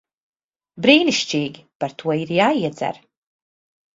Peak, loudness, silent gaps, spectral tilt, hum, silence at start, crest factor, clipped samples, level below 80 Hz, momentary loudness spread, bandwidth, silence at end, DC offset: 0 dBFS; -19 LUFS; 1.75-1.80 s; -4.5 dB/octave; none; 0.75 s; 22 dB; under 0.1%; -64 dBFS; 15 LU; 7.8 kHz; 1 s; under 0.1%